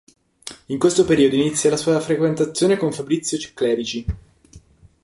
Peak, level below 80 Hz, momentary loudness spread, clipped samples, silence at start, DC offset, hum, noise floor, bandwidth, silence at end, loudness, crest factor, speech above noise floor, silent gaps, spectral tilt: -4 dBFS; -42 dBFS; 15 LU; under 0.1%; 0.45 s; under 0.1%; none; -48 dBFS; 11.5 kHz; 0.45 s; -19 LUFS; 18 dB; 30 dB; none; -5 dB/octave